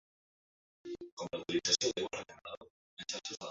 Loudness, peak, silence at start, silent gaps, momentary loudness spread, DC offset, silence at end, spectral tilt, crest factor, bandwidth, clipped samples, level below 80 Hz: -36 LUFS; -14 dBFS; 0.85 s; 1.12-1.17 s, 2.57-2.61 s, 2.70-2.97 s; 20 LU; under 0.1%; 0 s; -1.5 dB/octave; 26 dB; 8 kHz; under 0.1%; -74 dBFS